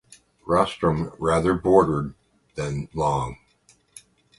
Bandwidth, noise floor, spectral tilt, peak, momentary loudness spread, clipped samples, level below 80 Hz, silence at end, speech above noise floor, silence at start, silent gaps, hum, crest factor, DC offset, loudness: 11.5 kHz; -60 dBFS; -6.5 dB/octave; -2 dBFS; 16 LU; under 0.1%; -44 dBFS; 1.05 s; 39 dB; 0.45 s; none; none; 22 dB; under 0.1%; -23 LUFS